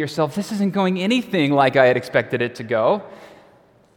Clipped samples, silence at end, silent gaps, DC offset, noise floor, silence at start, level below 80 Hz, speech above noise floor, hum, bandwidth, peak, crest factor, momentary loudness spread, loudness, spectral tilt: under 0.1%; 0.65 s; none; under 0.1%; -53 dBFS; 0 s; -64 dBFS; 34 dB; none; 17 kHz; 0 dBFS; 20 dB; 8 LU; -19 LUFS; -6 dB/octave